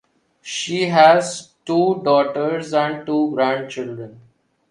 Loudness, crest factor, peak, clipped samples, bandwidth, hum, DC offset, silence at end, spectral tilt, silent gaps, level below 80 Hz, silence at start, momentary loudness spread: -18 LUFS; 18 dB; 0 dBFS; under 0.1%; 11.5 kHz; none; under 0.1%; 0.55 s; -4.5 dB/octave; none; -68 dBFS; 0.45 s; 18 LU